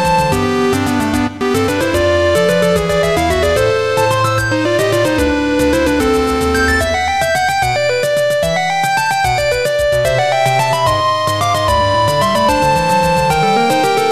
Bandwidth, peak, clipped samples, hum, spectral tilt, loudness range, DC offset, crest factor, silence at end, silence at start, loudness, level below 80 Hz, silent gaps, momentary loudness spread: 15.5 kHz; 0 dBFS; under 0.1%; none; -4.5 dB/octave; 1 LU; 0.9%; 12 dB; 0 s; 0 s; -13 LUFS; -30 dBFS; none; 2 LU